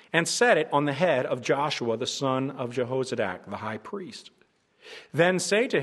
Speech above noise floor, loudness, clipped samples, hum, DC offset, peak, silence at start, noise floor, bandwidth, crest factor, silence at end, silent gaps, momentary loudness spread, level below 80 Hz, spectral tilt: 35 dB; -26 LUFS; under 0.1%; none; under 0.1%; -4 dBFS; 0.15 s; -61 dBFS; 12.5 kHz; 22 dB; 0 s; none; 16 LU; -74 dBFS; -4 dB/octave